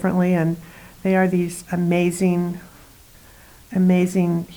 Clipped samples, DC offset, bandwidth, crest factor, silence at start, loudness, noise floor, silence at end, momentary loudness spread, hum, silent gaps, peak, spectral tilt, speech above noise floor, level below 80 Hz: under 0.1%; under 0.1%; over 20 kHz; 14 dB; 0 s; -20 LUFS; -47 dBFS; 0 s; 10 LU; none; none; -8 dBFS; -7.5 dB/octave; 28 dB; -52 dBFS